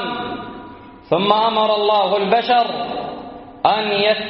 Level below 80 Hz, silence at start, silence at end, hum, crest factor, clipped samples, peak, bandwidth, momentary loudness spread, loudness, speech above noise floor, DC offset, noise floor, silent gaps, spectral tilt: -54 dBFS; 0 s; 0 s; none; 18 dB; under 0.1%; 0 dBFS; 5.8 kHz; 18 LU; -17 LUFS; 22 dB; under 0.1%; -38 dBFS; none; -1.5 dB/octave